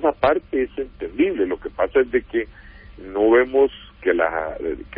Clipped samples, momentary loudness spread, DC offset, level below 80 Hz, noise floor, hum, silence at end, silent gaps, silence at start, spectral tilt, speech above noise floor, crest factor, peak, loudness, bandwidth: under 0.1%; 13 LU; under 0.1%; -44 dBFS; -39 dBFS; none; 0 s; none; 0 s; -10 dB/octave; 15 dB; 16 dB; -4 dBFS; -21 LUFS; 4.8 kHz